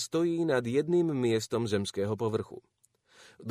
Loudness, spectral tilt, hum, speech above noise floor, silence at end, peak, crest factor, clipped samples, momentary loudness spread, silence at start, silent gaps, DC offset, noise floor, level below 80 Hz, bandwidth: -30 LUFS; -6 dB/octave; none; 31 dB; 0 s; -16 dBFS; 16 dB; under 0.1%; 12 LU; 0 s; none; under 0.1%; -60 dBFS; -68 dBFS; 14.5 kHz